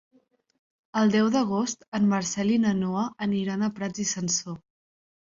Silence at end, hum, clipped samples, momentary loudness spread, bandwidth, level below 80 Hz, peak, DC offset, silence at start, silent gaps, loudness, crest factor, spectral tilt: 0.65 s; none; under 0.1%; 7 LU; 7.8 kHz; -64 dBFS; -12 dBFS; under 0.1%; 0.95 s; 1.88-1.92 s; -26 LUFS; 14 dB; -4.5 dB/octave